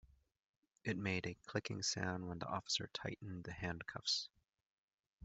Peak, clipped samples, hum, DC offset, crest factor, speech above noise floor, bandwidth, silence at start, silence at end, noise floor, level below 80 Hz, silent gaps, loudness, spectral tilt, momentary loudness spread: -22 dBFS; under 0.1%; none; under 0.1%; 24 dB; over 47 dB; 8.2 kHz; 0.05 s; 0 s; under -90 dBFS; -70 dBFS; 0.39-0.63 s, 4.66-4.88 s, 4.94-4.98 s, 5.07-5.19 s; -42 LUFS; -3.5 dB/octave; 8 LU